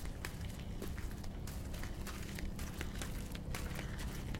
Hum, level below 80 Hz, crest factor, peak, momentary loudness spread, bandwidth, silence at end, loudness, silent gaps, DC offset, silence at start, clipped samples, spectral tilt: none; -46 dBFS; 22 dB; -20 dBFS; 2 LU; 17 kHz; 0 s; -45 LUFS; none; under 0.1%; 0 s; under 0.1%; -5 dB/octave